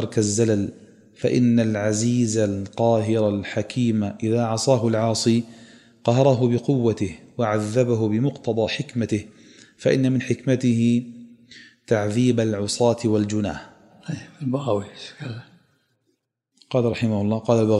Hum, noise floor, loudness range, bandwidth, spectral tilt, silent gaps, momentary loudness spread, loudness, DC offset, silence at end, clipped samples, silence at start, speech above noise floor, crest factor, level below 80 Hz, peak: none; -72 dBFS; 6 LU; 11.5 kHz; -6 dB/octave; none; 10 LU; -22 LUFS; under 0.1%; 0 s; under 0.1%; 0 s; 52 dB; 18 dB; -60 dBFS; -4 dBFS